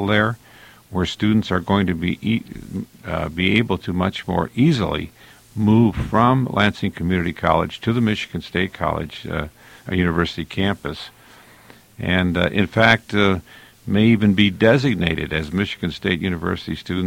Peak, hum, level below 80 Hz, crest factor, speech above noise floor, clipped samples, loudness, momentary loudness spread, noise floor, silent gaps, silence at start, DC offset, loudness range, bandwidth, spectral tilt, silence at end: 0 dBFS; none; -42 dBFS; 20 dB; 28 dB; under 0.1%; -20 LUFS; 12 LU; -47 dBFS; none; 0 s; under 0.1%; 6 LU; 16 kHz; -7 dB/octave; 0 s